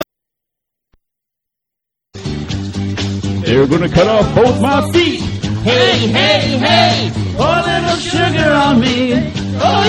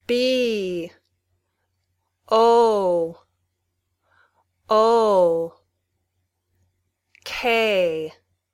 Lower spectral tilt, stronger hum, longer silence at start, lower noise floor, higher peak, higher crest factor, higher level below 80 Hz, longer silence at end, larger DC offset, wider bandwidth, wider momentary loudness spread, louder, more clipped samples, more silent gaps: about the same, -5.5 dB/octave vs -4.5 dB/octave; neither; about the same, 0 s vs 0.1 s; first, -81 dBFS vs -75 dBFS; first, 0 dBFS vs -6 dBFS; about the same, 14 dB vs 18 dB; first, -34 dBFS vs -62 dBFS; second, 0 s vs 0.45 s; neither; second, 12.5 kHz vs 15.5 kHz; second, 10 LU vs 15 LU; first, -13 LUFS vs -20 LUFS; neither; neither